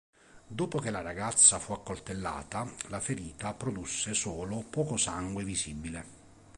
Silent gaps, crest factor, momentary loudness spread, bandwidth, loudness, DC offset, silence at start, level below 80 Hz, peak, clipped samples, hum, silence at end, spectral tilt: none; 24 dB; 18 LU; 11.5 kHz; -30 LUFS; under 0.1%; 0.35 s; -54 dBFS; -8 dBFS; under 0.1%; none; 0.05 s; -3 dB/octave